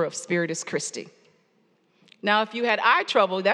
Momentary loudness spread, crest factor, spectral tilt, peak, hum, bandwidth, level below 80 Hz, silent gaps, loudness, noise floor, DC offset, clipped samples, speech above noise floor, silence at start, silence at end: 11 LU; 20 dB; -3 dB/octave; -6 dBFS; none; 12 kHz; -88 dBFS; none; -23 LUFS; -65 dBFS; under 0.1%; under 0.1%; 42 dB; 0 s; 0 s